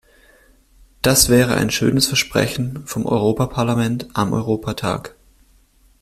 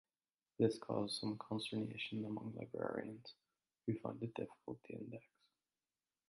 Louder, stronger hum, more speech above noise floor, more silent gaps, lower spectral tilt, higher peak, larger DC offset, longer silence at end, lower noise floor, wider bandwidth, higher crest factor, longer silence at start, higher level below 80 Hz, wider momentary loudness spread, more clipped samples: first, -18 LUFS vs -44 LUFS; neither; second, 36 dB vs over 47 dB; neither; second, -4 dB/octave vs -6 dB/octave; first, 0 dBFS vs -20 dBFS; neither; second, 0.9 s vs 1.1 s; second, -54 dBFS vs under -90 dBFS; first, 16 kHz vs 11 kHz; about the same, 20 dB vs 24 dB; first, 1.05 s vs 0.6 s; first, -40 dBFS vs -80 dBFS; second, 11 LU vs 14 LU; neither